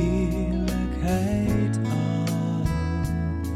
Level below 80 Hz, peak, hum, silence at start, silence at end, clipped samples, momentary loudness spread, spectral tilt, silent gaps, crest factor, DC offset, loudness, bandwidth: -32 dBFS; -10 dBFS; none; 0 s; 0 s; under 0.1%; 3 LU; -7.5 dB/octave; none; 14 dB; under 0.1%; -25 LUFS; 15 kHz